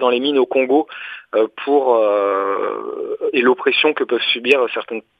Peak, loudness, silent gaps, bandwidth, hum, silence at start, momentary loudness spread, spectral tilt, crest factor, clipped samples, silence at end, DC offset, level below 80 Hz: 0 dBFS; -17 LUFS; none; 8.2 kHz; none; 0 s; 10 LU; -4.5 dB/octave; 16 dB; under 0.1%; 0.2 s; under 0.1%; -74 dBFS